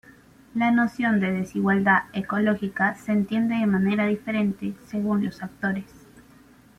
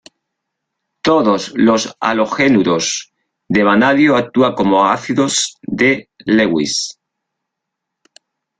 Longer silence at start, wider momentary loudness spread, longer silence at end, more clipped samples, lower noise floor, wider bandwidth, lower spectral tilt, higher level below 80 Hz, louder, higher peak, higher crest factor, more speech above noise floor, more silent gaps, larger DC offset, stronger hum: second, 0.55 s vs 1.05 s; about the same, 8 LU vs 8 LU; second, 0.6 s vs 1.7 s; neither; second, -53 dBFS vs -78 dBFS; first, 11.5 kHz vs 9.4 kHz; first, -7.5 dB/octave vs -4 dB/octave; second, -60 dBFS vs -54 dBFS; second, -24 LUFS vs -14 LUFS; second, -6 dBFS vs 0 dBFS; about the same, 18 dB vs 14 dB; second, 29 dB vs 65 dB; neither; neither; neither